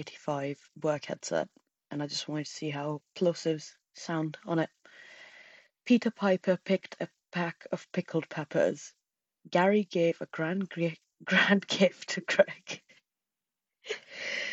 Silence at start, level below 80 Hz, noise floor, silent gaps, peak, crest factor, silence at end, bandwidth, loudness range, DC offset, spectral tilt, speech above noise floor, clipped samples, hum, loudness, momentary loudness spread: 0 s; -80 dBFS; -90 dBFS; none; -8 dBFS; 24 dB; 0 s; 8.2 kHz; 6 LU; under 0.1%; -5 dB/octave; 60 dB; under 0.1%; none; -31 LUFS; 17 LU